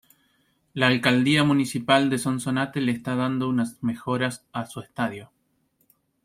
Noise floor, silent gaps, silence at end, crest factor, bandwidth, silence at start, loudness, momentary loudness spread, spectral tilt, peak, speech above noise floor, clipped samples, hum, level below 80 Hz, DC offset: -69 dBFS; none; 1 s; 22 dB; 15.5 kHz; 0.75 s; -24 LUFS; 14 LU; -5 dB/octave; -4 dBFS; 45 dB; under 0.1%; none; -64 dBFS; under 0.1%